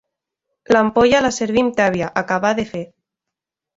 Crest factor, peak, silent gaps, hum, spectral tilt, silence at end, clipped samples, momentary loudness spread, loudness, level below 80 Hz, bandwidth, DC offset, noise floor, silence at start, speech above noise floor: 18 dB; 0 dBFS; none; none; -4.5 dB/octave; 0.95 s; under 0.1%; 12 LU; -17 LUFS; -50 dBFS; 7.8 kHz; under 0.1%; -84 dBFS; 0.7 s; 67 dB